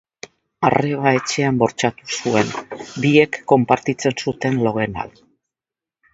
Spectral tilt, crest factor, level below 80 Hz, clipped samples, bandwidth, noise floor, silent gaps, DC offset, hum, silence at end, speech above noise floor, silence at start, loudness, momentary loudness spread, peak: -5.5 dB/octave; 20 dB; -54 dBFS; under 0.1%; 8 kHz; -89 dBFS; none; under 0.1%; none; 1.05 s; 71 dB; 0.6 s; -18 LUFS; 15 LU; 0 dBFS